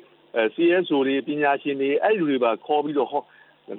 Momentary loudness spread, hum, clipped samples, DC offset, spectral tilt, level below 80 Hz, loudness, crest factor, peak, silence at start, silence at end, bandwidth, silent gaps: 5 LU; none; under 0.1%; under 0.1%; -9.5 dB/octave; -82 dBFS; -23 LUFS; 16 dB; -6 dBFS; 0.35 s; 0 s; 4.1 kHz; none